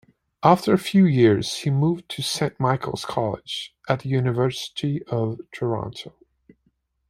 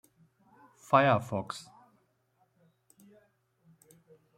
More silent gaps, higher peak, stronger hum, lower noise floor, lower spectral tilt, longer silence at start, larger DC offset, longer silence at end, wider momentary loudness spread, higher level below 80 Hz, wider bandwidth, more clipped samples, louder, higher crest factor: neither; first, -2 dBFS vs -8 dBFS; neither; second, -69 dBFS vs -73 dBFS; about the same, -6 dB/octave vs -6 dB/octave; second, 0.4 s vs 0.9 s; neither; second, 1 s vs 2.75 s; second, 12 LU vs 18 LU; first, -56 dBFS vs -72 dBFS; about the same, 14.5 kHz vs 15.5 kHz; neither; first, -22 LUFS vs -28 LUFS; about the same, 22 dB vs 26 dB